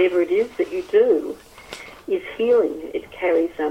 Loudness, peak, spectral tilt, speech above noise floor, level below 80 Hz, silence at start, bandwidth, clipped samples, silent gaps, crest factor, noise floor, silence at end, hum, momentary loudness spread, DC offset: -21 LUFS; -6 dBFS; -5 dB/octave; 19 dB; -56 dBFS; 0 s; 15.5 kHz; under 0.1%; none; 14 dB; -39 dBFS; 0 s; none; 18 LU; under 0.1%